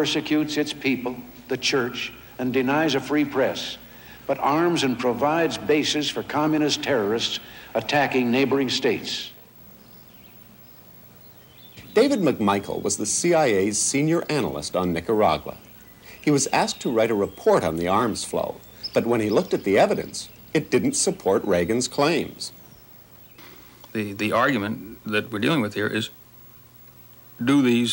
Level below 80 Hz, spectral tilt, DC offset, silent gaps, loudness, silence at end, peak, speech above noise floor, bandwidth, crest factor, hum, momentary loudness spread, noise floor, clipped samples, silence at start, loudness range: -56 dBFS; -4 dB/octave; under 0.1%; none; -23 LUFS; 0 s; -8 dBFS; 26 dB; 16.5 kHz; 16 dB; 60 Hz at -55 dBFS; 12 LU; -48 dBFS; under 0.1%; 0 s; 4 LU